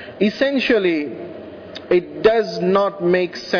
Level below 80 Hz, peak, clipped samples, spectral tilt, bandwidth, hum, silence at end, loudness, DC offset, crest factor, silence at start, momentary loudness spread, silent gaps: -54 dBFS; -4 dBFS; under 0.1%; -6.5 dB/octave; 5.4 kHz; none; 0 s; -18 LUFS; under 0.1%; 14 dB; 0 s; 17 LU; none